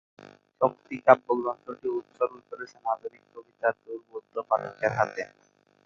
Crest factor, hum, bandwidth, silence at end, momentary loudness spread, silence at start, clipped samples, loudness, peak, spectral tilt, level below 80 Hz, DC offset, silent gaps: 26 dB; 50 Hz at -65 dBFS; 7 kHz; 0.6 s; 19 LU; 0.6 s; under 0.1%; -28 LUFS; -2 dBFS; -6.5 dB/octave; -72 dBFS; under 0.1%; none